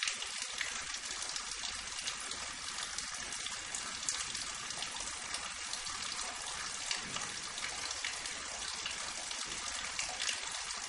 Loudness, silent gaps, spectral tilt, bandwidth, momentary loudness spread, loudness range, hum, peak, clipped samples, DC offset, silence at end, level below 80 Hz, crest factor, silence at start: -38 LUFS; none; 1 dB/octave; 11.5 kHz; 3 LU; 1 LU; none; -12 dBFS; under 0.1%; under 0.1%; 0 s; -64 dBFS; 28 dB; 0 s